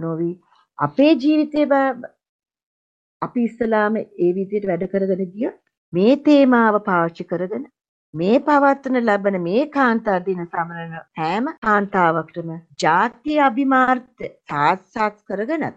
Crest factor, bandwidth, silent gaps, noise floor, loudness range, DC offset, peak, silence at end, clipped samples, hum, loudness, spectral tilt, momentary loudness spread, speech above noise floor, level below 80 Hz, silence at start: 18 dB; 8.2 kHz; 2.29-2.39 s, 2.63-3.20 s, 5.77-5.92 s, 7.89-8.13 s, 11.58-11.62 s; under -90 dBFS; 4 LU; under 0.1%; -2 dBFS; 0.05 s; under 0.1%; none; -19 LUFS; -7 dB/octave; 12 LU; over 71 dB; -62 dBFS; 0 s